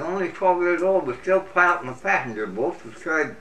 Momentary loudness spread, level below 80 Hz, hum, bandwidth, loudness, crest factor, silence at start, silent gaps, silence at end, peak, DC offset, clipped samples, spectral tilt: 9 LU; -62 dBFS; none; 9.6 kHz; -22 LUFS; 18 dB; 0 s; none; 0 s; -4 dBFS; 0.6%; under 0.1%; -6 dB/octave